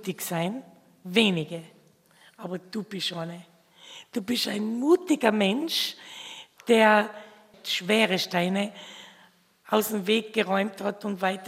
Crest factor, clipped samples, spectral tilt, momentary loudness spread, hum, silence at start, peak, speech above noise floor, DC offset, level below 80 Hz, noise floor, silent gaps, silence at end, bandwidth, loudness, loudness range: 24 dB; under 0.1%; -4.5 dB/octave; 18 LU; none; 0 s; -4 dBFS; 33 dB; under 0.1%; -78 dBFS; -59 dBFS; none; 0 s; 16 kHz; -25 LUFS; 6 LU